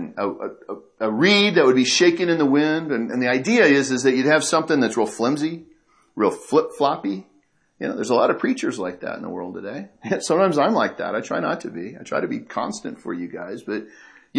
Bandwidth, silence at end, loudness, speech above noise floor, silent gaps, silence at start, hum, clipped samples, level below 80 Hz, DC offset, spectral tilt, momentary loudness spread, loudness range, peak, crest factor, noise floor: 11 kHz; 0 s; -20 LUFS; 41 dB; none; 0 s; none; under 0.1%; -70 dBFS; under 0.1%; -4 dB/octave; 16 LU; 8 LU; -2 dBFS; 18 dB; -61 dBFS